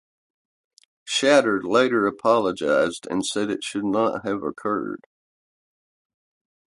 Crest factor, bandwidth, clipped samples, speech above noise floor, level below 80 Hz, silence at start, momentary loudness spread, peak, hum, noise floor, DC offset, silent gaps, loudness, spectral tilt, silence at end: 20 dB; 11.5 kHz; under 0.1%; over 68 dB; -64 dBFS; 1.05 s; 9 LU; -4 dBFS; none; under -90 dBFS; under 0.1%; none; -22 LUFS; -4 dB/octave; 1.8 s